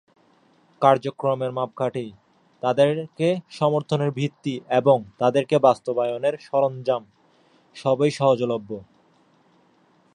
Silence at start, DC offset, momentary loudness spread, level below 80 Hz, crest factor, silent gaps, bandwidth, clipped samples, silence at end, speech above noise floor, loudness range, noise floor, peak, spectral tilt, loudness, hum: 0.8 s; under 0.1%; 9 LU; -70 dBFS; 20 dB; none; 10.5 kHz; under 0.1%; 1.3 s; 38 dB; 3 LU; -60 dBFS; -2 dBFS; -7 dB/octave; -22 LUFS; none